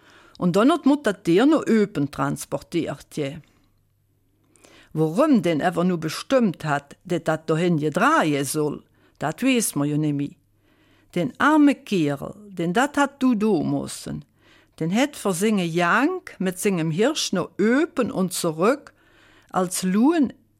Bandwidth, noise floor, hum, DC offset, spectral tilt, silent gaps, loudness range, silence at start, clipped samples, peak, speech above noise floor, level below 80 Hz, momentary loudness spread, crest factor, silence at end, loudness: 16.5 kHz; -65 dBFS; none; under 0.1%; -5.5 dB/octave; none; 3 LU; 0.4 s; under 0.1%; -8 dBFS; 43 dB; -60 dBFS; 11 LU; 16 dB; 0.3 s; -22 LUFS